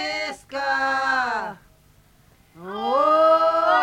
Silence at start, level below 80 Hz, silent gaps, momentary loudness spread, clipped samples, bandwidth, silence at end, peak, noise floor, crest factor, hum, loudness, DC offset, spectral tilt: 0 s; -60 dBFS; none; 15 LU; under 0.1%; 12.5 kHz; 0 s; -6 dBFS; -56 dBFS; 16 dB; none; -21 LUFS; under 0.1%; -3 dB/octave